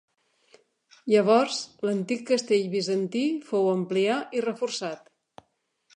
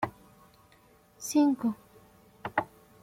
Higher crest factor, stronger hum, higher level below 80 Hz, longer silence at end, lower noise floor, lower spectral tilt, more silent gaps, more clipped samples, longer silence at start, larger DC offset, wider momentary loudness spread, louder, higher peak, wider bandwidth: about the same, 18 dB vs 20 dB; neither; second, -82 dBFS vs -68 dBFS; first, 1 s vs 0.4 s; first, -72 dBFS vs -61 dBFS; about the same, -5 dB/octave vs -4.5 dB/octave; neither; neither; first, 1.05 s vs 0 s; neither; second, 8 LU vs 19 LU; first, -26 LUFS vs -30 LUFS; first, -8 dBFS vs -12 dBFS; second, 10.5 kHz vs 16 kHz